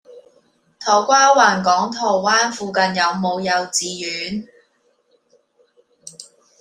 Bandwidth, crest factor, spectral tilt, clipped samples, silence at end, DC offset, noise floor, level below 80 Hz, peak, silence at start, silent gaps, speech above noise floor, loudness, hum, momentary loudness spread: 14.5 kHz; 18 dB; -2.5 dB/octave; under 0.1%; 0.35 s; under 0.1%; -62 dBFS; -64 dBFS; -2 dBFS; 0.1 s; none; 45 dB; -17 LUFS; none; 15 LU